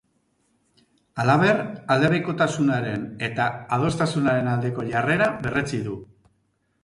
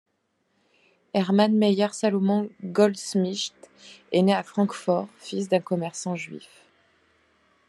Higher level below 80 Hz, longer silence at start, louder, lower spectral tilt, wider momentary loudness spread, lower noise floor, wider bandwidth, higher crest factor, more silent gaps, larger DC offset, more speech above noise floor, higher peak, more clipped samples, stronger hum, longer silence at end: first, -54 dBFS vs -76 dBFS; about the same, 1.15 s vs 1.15 s; about the same, -23 LUFS vs -25 LUFS; about the same, -6.5 dB/octave vs -5.5 dB/octave; about the same, 9 LU vs 11 LU; about the same, -69 dBFS vs -72 dBFS; about the same, 11.5 kHz vs 12 kHz; about the same, 18 dB vs 20 dB; neither; neither; about the same, 47 dB vs 48 dB; about the same, -6 dBFS vs -6 dBFS; neither; neither; second, 0.8 s vs 1.3 s